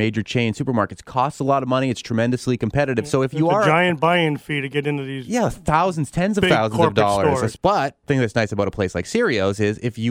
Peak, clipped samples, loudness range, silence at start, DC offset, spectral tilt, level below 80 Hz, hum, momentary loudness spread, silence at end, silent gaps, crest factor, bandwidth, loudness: -4 dBFS; under 0.1%; 2 LU; 0 s; under 0.1%; -6 dB/octave; -46 dBFS; none; 6 LU; 0 s; none; 16 dB; 16 kHz; -20 LUFS